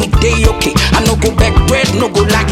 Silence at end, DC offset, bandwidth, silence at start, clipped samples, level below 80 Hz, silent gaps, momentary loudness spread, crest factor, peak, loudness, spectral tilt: 0 s; under 0.1%; 16.5 kHz; 0 s; under 0.1%; -16 dBFS; none; 2 LU; 10 dB; 0 dBFS; -11 LUFS; -4.5 dB/octave